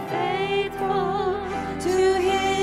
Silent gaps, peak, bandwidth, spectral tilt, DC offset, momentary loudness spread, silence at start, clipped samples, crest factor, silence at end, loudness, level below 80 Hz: none; -10 dBFS; 14 kHz; -4.5 dB/octave; under 0.1%; 7 LU; 0 s; under 0.1%; 12 dB; 0 s; -23 LUFS; -48 dBFS